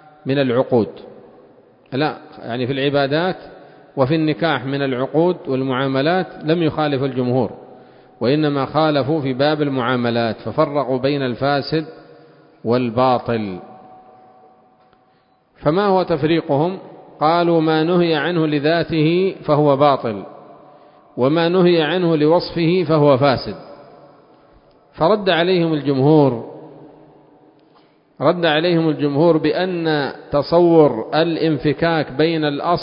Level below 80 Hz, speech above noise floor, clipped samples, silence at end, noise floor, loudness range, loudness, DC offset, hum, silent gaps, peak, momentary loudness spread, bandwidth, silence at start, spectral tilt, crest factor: -54 dBFS; 41 dB; under 0.1%; 0 s; -57 dBFS; 5 LU; -17 LUFS; under 0.1%; none; none; 0 dBFS; 9 LU; 5.4 kHz; 0.25 s; -11.5 dB/octave; 18 dB